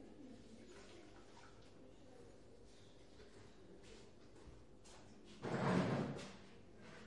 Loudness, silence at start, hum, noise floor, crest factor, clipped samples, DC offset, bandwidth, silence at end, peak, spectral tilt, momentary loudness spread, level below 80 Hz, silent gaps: -42 LUFS; 0 s; none; -64 dBFS; 22 dB; under 0.1%; under 0.1%; 11 kHz; 0 s; -26 dBFS; -6.5 dB/octave; 23 LU; -70 dBFS; none